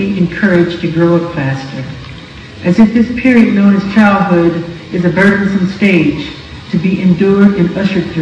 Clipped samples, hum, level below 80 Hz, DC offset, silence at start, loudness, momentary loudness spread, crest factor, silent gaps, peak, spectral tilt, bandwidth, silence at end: 1%; none; -38 dBFS; under 0.1%; 0 s; -11 LUFS; 15 LU; 10 dB; none; 0 dBFS; -8 dB/octave; 8.2 kHz; 0 s